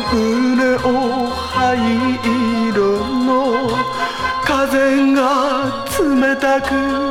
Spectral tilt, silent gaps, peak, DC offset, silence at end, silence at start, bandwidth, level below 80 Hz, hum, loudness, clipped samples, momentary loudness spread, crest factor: -5 dB/octave; none; -4 dBFS; under 0.1%; 0 s; 0 s; 16.5 kHz; -40 dBFS; none; -16 LUFS; under 0.1%; 5 LU; 12 dB